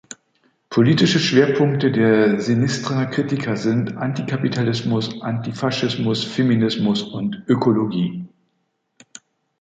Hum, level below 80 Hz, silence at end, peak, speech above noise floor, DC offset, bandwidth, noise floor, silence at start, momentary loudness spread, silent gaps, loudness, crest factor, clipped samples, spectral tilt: none; -58 dBFS; 1.35 s; -2 dBFS; 52 dB; under 0.1%; 9 kHz; -70 dBFS; 0.1 s; 10 LU; none; -19 LUFS; 18 dB; under 0.1%; -6 dB/octave